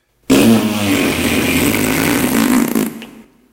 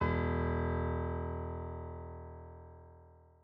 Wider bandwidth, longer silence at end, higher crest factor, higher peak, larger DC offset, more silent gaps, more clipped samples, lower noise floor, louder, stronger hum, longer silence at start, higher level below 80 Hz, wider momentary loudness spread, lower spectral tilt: first, 17.5 kHz vs 4.9 kHz; about the same, 0.3 s vs 0.2 s; about the same, 14 dB vs 16 dB; first, 0 dBFS vs -20 dBFS; neither; neither; neither; second, -38 dBFS vs -59 dBFS; first, -14 LUFS vs -37 LUFS; neither; first, 0.3 s vs 0 s; first, -38 dBFS vs -48 dBFS; second, 6 LU vs 20 LU; second, -4 dB/octave vs -7.5 dB/octave